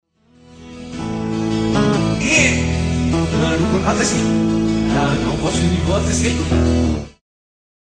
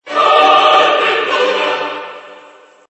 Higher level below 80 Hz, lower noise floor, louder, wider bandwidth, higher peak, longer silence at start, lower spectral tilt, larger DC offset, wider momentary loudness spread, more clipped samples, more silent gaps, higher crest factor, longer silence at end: first, -30 dBFS vs -68 dBFS; first, -48 dBFS vs -42 dBFS; second, -17 LUFS vs -11 LUFS; first, 10 kHz vs 8.4 kHz; about the same, -2 dBFS vs 0 dBFS; first, 0.5 s vs 0.05 s; first, -5 dB/octave vs -2 dB/octave; neither; second, 10 LU vs 15 LU; neither; neither; about the same, 16 dB vs 14 dB; first, 0.7 s vs 0.55 s